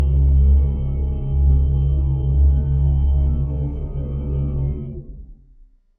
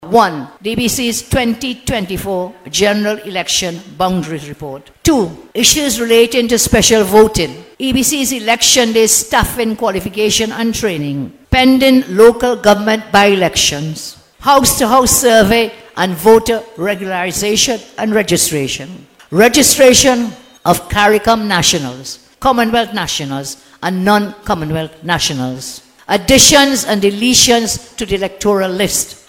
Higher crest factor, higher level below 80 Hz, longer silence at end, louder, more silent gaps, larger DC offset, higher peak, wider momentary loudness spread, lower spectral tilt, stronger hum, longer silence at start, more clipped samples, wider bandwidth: about the same, 12 dB vs 12 dB; first, -18 dBFS vs -34 dBFS; first, 0.65 s vs 0.15 s; second, -20 LUFS vs -12 LUFS; neither; neither; second, -6 dBFS vs 0 dBFS; second, 10 LU vs 13 LU; first, -13 dB/octave vs -3 dB/octave; neither; about the same, 0 s vs 0 s; second, under 0.1% vs 0.3%; second, 1.4 kHz vs 19 kHz